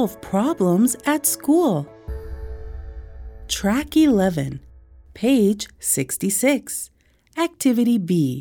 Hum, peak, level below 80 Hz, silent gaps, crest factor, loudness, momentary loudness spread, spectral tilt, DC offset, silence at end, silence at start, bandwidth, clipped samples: none; -6 dBFS; -40 dBFS; none; 16 dB; -20 LUFS; 19 LU; -5 dB/octave; under 0.1%; 0 s; 0 s; over 20 kHz; under 0.1%